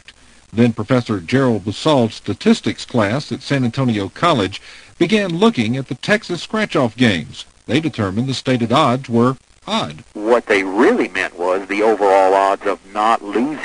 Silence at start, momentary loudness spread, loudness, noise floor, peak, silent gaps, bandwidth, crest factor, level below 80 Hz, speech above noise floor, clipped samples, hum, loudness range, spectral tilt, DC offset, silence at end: 0.55 s; 8 LU; -17 LUFS; -45 dBFS; 0 dBFS; none; 10.5 kHz; 16 dB; -54 dBFS; 29 dB; under 0.1%; none; 2 LU; -6 dB/octave; under 0.1%; 0 s